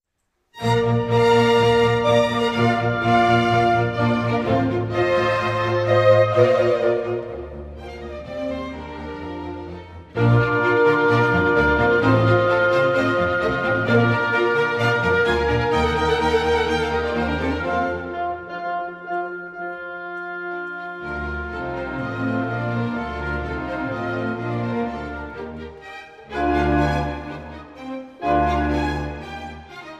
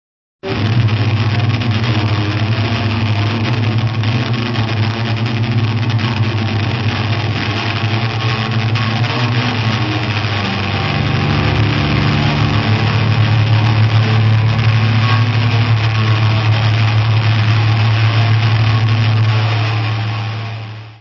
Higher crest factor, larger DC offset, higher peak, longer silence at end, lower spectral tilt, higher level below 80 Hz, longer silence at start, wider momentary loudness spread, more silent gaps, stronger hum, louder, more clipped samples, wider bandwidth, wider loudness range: about the same, 16 dB vs 12 dB; neither; about the same, -4 dBFS vs -2 dBFS; about the same, 0 s vs 0.05 s; about the same, -7 dB/octave vs -7 dB/octave; about the same, -38 dBFS vs -34 dBFS; about the same, 0.55 s vs 0.45 s; first, 16 LU vs 4 LU; neither; neither; second, -20 LUFS vs -15 LUFS; neither; first, 11 kHz vs 6.4 kHz; first, 10 LU vs 3 LU